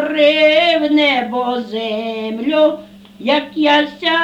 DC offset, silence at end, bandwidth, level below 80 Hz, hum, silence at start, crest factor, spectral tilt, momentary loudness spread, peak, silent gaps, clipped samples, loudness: under 0.1%; 0 s; 8.4 kHz; -58 dBFS; none; 0 s; 14 dB; -4.5 dB/octave; 10 LU; -2 dBFS; none; under 0.1%; -15 LUFS